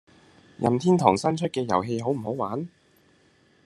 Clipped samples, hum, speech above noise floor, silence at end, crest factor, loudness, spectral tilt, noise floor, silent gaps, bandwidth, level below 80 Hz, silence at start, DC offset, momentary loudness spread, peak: under 0.1%; none; 37 dB; 1 s; 24 dB; -25 LUFS; -6.5 dB/octave; -61 dBFS; none; 11.5 kHz; -66 dBFS; 0.6 s; under 0.1%; 10 LU; -2 dBFS